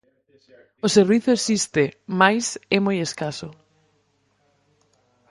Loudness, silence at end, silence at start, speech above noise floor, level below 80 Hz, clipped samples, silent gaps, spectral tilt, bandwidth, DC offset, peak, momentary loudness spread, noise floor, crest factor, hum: -20 LUFS; 1.8 s; 0.85 s; 45 dB; -62 dBFS; under 0.1%; none; -4 dB/octave; 11.5 kHz; under 0.1%; -2 dBFS; 12 LU; -66 dBFS; 22 dB; 50 Hz at -45 dBFS